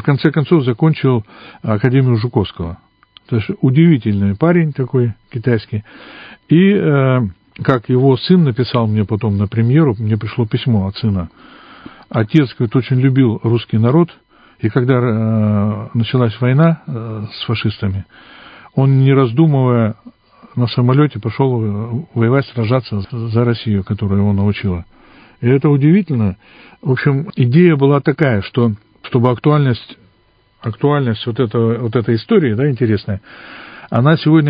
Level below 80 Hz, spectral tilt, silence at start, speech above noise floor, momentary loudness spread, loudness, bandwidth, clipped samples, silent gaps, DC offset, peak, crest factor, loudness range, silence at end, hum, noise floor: -40 dBFS; -11 dB/octave; 0 s; 41 dB; 11 LU; -15 LUFS; 5.2 kHz; under 0.1%; none; under 0.1%; 0 dBFS; 14 dB; 3 LU; 0 s; none; -55 dBFS